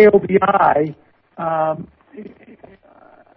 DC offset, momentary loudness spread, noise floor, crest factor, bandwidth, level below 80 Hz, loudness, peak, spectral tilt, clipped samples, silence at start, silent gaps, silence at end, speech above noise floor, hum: under 0.1%; 25 LU; -48 dBFS; 16 dB; 4.9 kHz; -52 dBFS; -17 LUFS; -2 dBFS; -11 dB/octave; under 0.1%; 0 s; none; 1.1 s; 33 dB; none